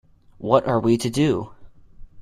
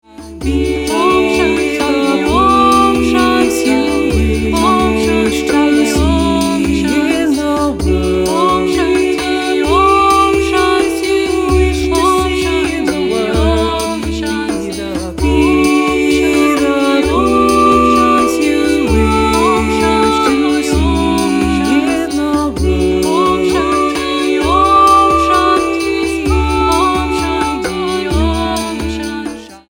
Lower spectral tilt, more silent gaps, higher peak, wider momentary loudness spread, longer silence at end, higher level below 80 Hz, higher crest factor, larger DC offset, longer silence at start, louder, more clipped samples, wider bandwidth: first, -6.5 dB/octave vs -5 dB/octave; neither; about the same, -2 dBFS vs 0 dBFS; first, 13 LU vs 7 LU; about the same, 0 s vs 0.1 s; second, -48 dBFS vs -26 dBFS; first, 20 dB vs 12 dB; neither; first, 0.4 s vs 0.2 s; second, -21 LUFS vs -12 LUFS; neither; second, 15 kHz vs 17.5 kHz